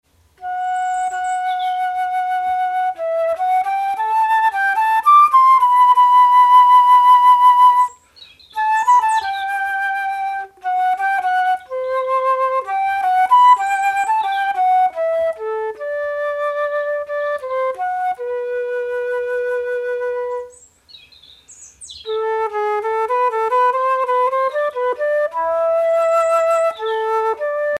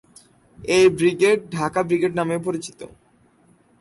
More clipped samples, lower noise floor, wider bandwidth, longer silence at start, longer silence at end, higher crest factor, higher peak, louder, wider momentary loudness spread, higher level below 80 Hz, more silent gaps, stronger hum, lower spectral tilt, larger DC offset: neither; second, -46 dBFS vs -57 dBFS; first, 13 kHz vs 11.5 kHz; second, 0.4 s vs 0.6 s; second, 0 s vs 0.95 s; about the same, 14 dB vs 16 dB; first, -2 dBFS vs -6 dBFS; first, -16 LUFS vs -20 LUFS; second, 12 LU vs 19 LU; second, -62 dBFS vs -56 dBFS; neither; neither; second, -0.5 dB/octave vs -5 dB/octave; neither